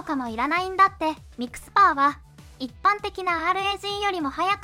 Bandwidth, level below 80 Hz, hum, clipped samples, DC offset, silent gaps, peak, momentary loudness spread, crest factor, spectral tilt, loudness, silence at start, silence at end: 16 kHz; -52 dBFS; none; under 0.1%; under 0.1%; none; -6 dBFS; 16 LU; 18 dB; -3.5 dB/octave; -23 LUFS; 0 s; 0 s